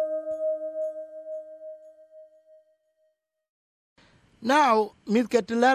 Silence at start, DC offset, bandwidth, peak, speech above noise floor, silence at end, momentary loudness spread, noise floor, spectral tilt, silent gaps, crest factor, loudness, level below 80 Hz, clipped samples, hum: 0 s; under 0.1%; 14.5 kHz; -8 dBFS; 51 dB; 0 s; 22 LU; -73 dBFS; -4.5 dB/octave; 3.49-3.96 s; 20 dB; -25 LUFS; -72 dBFS; under 0.1%; none